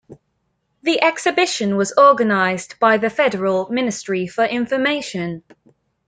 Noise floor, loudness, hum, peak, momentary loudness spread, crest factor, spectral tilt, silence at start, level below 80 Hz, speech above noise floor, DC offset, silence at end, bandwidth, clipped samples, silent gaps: -70 dBFS; -18 LUFS; none; -2 dBFS; 11 LU; 18 dB; -4 dB/octave; 0.1 s; -62 dBFS; 52 dB; under 0.1%; 0.7 s; 9.6 kHz; under 0.1%; none